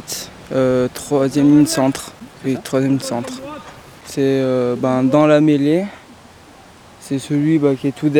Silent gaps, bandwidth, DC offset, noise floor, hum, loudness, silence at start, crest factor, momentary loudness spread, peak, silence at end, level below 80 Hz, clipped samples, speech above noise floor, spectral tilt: none; 18 kHz; under 0.1%; -43 dBFS; none; -16 LUFS; 0 s; 16 dB; 16 LU; 0 dBFS; 0 s; -52 dBFS; under 0.1%; 27 dB; -6 dB/octave